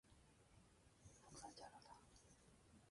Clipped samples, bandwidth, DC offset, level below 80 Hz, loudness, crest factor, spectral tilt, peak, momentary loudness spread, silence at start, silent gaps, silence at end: under 0.1%; 11.5 kHz; under 0.1%; -78 dBFS; -63 LUFS; 20 dB; -3.5 dB/octave; -46 dBFS; 10 LU; 0.05 s; none; 0 s